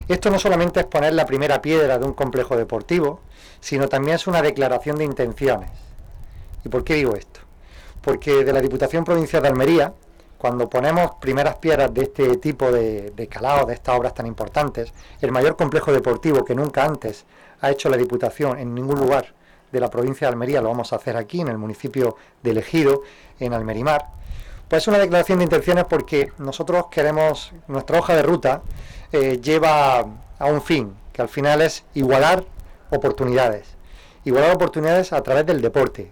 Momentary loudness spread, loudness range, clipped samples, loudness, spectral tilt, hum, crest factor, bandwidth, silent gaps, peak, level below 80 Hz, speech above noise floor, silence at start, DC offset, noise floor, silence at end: 11 LU; 4 LU; under 0.1%; -20 LUFS; -6 dB/octave; none; 12 dB; over 20 kHz; none; -6 dBFS; -40 dBFS; 23 dB; 0 s; under 0.1%; -42 dBFS; 0 s